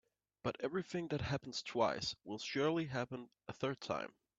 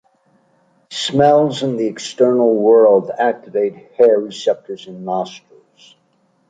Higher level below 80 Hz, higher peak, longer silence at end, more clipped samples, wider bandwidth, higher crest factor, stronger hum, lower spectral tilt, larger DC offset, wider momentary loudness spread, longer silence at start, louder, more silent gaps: second, -70 dBFS vs -62 dBFS; second, -20 dBFS vs -2 dBFS; second, 0.3 s vs 1.15 s; neither; second, 8 kHz vs 9.2 kHz; about the same, 20 dB vs 16 dB; neither; about the same, -5 dB/octave vs -5.5 dB/octave; neither; second, 8 LU vs 13 LU; second, 0.45 s vs 0.9 s; second, -40 LUFS vs -15 LUFS; neither